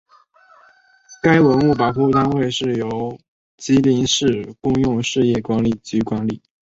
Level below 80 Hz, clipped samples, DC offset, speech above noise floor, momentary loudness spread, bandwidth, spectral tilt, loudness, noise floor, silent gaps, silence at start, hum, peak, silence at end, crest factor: -46 dBFS; under 0.1%; under 0.1%; 35 dB; 9 LU; 8 kHz; -5.5 dB/octave; -18 LUFS; -53 dBFS; 3.28-3.58 s; 1.1 s; none; -2 dBFS; 0.3 s; 16 dB